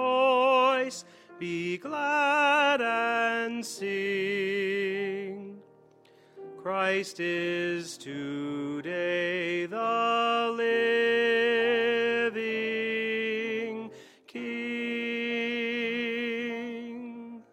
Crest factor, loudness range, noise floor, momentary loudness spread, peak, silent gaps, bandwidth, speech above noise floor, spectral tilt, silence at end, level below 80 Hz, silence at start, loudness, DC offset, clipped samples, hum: 18 dB; 6 LU; -58 dBFS; 15 LU; -12 dBFS; none; 14 kHz; 30 dB; -4 dB/octave; 0.1 s; -78 dBFS; 0 s; -28 LUFS; under 0.1%; under 0.1%; none